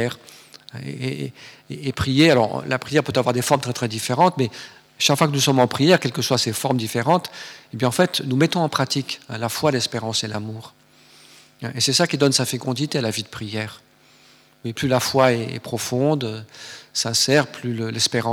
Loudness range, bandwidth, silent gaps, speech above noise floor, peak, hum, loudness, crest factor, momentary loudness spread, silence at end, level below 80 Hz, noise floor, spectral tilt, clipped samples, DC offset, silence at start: 4 LU; 20 kHz; none; 32 dB; 0 dBFS; none; -20 LUFS; 22 dB; 17 LU; 0 s; -56 dBFS; -53 dBFS; -4 dB/octave; under 0.1%; under 0.1%; 0 s